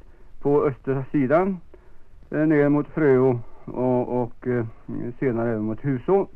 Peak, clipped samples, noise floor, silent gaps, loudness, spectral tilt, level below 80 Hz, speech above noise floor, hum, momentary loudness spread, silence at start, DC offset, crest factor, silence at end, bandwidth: -8 dBFS; under 0.1%; -41 dBFS; none; -23 LUFS; -11 dB/octave; -46 dBFS; 20 dB; none; 11 LU; 0.05 s; under 0.1%; 16 dB; 0 s; 3.8 kHz